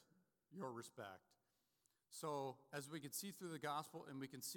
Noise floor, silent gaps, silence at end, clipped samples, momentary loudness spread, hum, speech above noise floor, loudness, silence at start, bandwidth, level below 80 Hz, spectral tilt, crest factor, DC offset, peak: -85 dBFS; none; 0 s; under 0.1%; 10 LU; none; 35 dB; -51 LUFS; 0 s; 18 kHz; under -90 dBFS; -4 dB/octave; 20 dB; under 0.1%; -34 dBFS